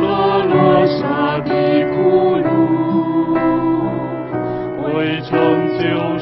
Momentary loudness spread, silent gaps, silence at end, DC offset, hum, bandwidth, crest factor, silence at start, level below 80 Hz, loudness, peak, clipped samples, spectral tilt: 8 LU; none; 0 s; under 0.1%; none; 5.8 kHz; 14 dB; 0 s; -48 dBFS; -16 LUFS; -2 dBFS; under 0.1%; -10 dB/octave